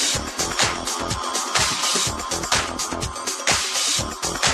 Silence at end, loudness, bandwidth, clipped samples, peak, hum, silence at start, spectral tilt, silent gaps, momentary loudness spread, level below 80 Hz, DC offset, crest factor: 0 s; -21 LUFS; 13.5 kHz; under 0.1%; -2 dBFS; none; 0 s; -1 dB/octave; none; 6 LU; -42 dBFS; under 0.1%; 20 dB